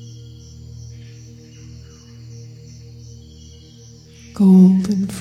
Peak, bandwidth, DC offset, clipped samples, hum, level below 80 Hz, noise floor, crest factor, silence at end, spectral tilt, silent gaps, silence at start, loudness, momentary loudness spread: -2 dBFS; 9.4 kHz; under 0.1%; under 0.1%; none; -50 dBFS; -42 dBFS; 18 dB; 0 s; -8.5 dB/octave; none; 0 s; -13 LUFS; 29 LU